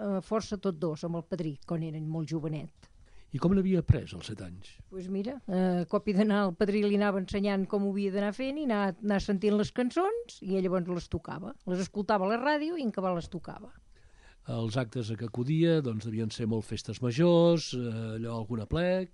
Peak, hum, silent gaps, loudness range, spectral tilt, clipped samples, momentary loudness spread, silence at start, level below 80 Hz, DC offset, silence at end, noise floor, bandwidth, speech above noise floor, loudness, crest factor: -8 dBFS; none; none; 4 LU; -7 dB/octave; under 0.1%; 12 LU; 0 s; -52 dBFS; under 0.1%; 0.05 s; -57 dBFS; 11 kHz; 27 dB; -30 LUFS; 22 dB